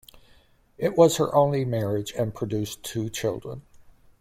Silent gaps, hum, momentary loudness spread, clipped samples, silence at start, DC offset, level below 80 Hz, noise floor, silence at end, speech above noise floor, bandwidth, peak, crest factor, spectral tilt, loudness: none; none; 12 LU; under 0.1%; 0.15 s; under 0.1%; -56 dBFS; -58 dBFS; 0.45 s; 34 dB; 16 kHz; -6 dBFS; 20 dB; -5.5 dB/octave; -25 LUFS